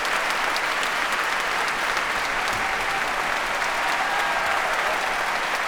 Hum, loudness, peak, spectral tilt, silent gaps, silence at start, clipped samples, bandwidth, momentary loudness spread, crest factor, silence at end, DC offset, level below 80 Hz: none; -23 LUFS; -6 dBFS; -1 dB/octave; none; 0 s; under 0.1%; over 20 kHz; 1 LU; 18 dB; 0 s; under 0.1%; -48 dBFS